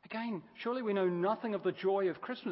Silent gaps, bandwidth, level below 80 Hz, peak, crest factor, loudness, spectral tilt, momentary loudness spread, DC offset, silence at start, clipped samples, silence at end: none; 5.6 kHz; -84 dBFS; -20 dBFS; 14 dB; -35 LUFS; -5 dB/octave; 8 LU; under 0.1%; 0.05 s; under 0.1%; 0 s